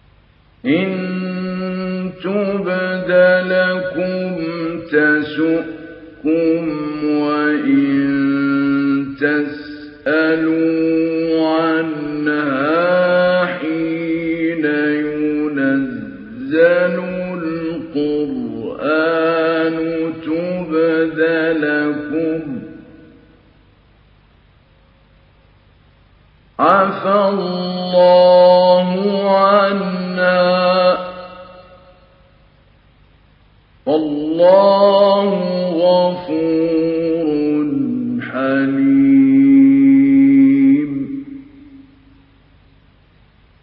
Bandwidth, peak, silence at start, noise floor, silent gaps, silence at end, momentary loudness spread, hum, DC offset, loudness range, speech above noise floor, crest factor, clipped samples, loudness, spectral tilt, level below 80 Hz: 5.2 kHz; 0 dBFS; 0.65 s; -51 dBFS; none; 1.8 s; 12 LU; none; under 0.1%; 7 LU; 35 dB; 16 dB; under 0.1%; -15 LUFS; -10 dB/octave; -54 dBFS